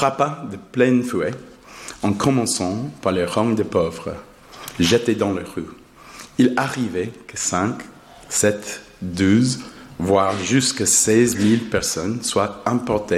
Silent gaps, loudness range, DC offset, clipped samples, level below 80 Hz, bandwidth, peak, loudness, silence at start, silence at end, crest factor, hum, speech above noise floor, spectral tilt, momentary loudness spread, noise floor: none; 4 LU; under 0.1%; under 0.1%; -52 dBFS; 16 kHz; -4 dBFS; -20 LUFS; 0 s; 0 s; 18 dB; none; 22 dB; -4 dB/octave; 16 LU; -41 dBFS